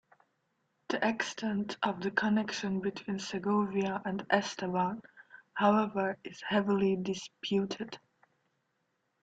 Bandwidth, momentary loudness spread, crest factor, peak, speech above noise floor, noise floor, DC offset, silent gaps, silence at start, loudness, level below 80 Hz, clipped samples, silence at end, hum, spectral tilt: 8 kHz; 9 LU; 24 dB; -10 dBFS; 47 dB; -79 dBFS; under 0.1%; none; 0.9 s; -32 LUFS; -72 dBFS; under 0.1%; 1.25 s; none; -5.5 dB/octave